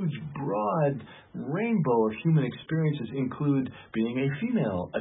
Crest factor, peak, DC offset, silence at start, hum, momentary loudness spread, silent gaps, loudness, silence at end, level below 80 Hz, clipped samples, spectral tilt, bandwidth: 14 dB; -12 dBFS; under 0.1%; 0 s; none; 9 LU; none; -28 LUFS; 0 s; -60 dBFS; under 0.1%; -12 dB/octave; 4 kHz